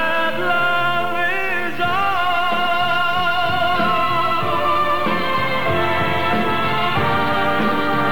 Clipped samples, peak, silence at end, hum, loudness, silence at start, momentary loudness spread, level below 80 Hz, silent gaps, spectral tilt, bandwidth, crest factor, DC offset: under 0.1%; -8 dBFS; 0 s; none; -18 LUFS; 0 s; 2 LU; -48 dBFS; none; -5.5 dB/octave; 19 kHz; 12 dB; 6%